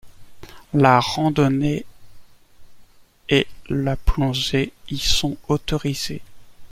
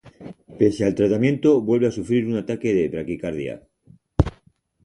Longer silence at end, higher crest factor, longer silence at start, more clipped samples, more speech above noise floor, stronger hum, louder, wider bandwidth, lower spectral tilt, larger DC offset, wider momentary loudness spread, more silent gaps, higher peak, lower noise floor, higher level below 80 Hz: second, 0.05 s vs 0.55 s; about the same, 20 dB vs 22 dB; about the same, 0.05 s vs 0.05 s; neither; second, 27 dB vs 39 dB; neither; about the same, -21 LUFS vs -21 LUFS; first, 16 kHz vs 11 kHz; second, -5 dB/octave vs -8 dB/octave; neither; second, 11 LU vs 14 LU; neither; about the same, -2 dBFS vs 0 dBFS; second, -47 dBFS vs -59 dBFS; first, -32 dBFS vs -40 dBFS